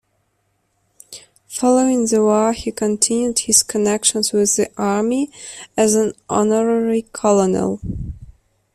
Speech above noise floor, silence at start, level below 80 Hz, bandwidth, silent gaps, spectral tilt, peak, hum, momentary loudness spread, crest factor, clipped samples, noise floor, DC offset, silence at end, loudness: 50 dB; 1.1 s; -44 dBFS; 14.5 kHz; none; -3.5 dB/octave; 0 dBFS; none; 15 LU; 18 dB; under 0.1%; -67 dBFS; under 0.1%; 0.5 s; -17 LUFS